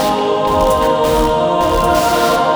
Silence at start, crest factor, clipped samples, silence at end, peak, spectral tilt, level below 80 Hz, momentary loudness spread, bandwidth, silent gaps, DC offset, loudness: 0 s; 12 dB; under 0.1%; 0 s; -2 dBFS; -4.5 dB/octave; -28 dBFS; 2 LU; over 20 kHz; none; under 0.1%; -13 LUFS